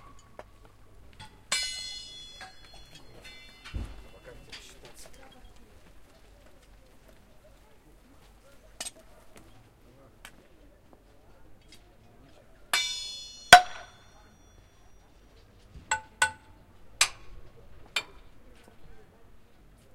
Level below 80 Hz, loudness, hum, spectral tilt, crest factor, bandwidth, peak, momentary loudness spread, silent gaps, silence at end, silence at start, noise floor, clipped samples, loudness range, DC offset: -54 dBFS; -26 LUFS; none; -0.5 dB/octave; 34 dB; 16 kHz; 0 dBFS; 25 LU; none; 0.95 s; 1.2 s; -56 dBFS; under 0.1%; 23 LU; under 0.1%